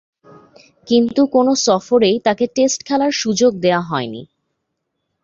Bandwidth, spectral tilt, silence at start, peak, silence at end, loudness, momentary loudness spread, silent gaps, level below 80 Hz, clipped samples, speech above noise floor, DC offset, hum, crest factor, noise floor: 7.6 kHz; -4 dB/octave; 0.85 s; -2 dBFS; 1 s; -16 LUFS; 7 LU; none; -58 dBFS; under 0.1%; 58 dB; under 0.1%; none; 16 dB; -74 dBFS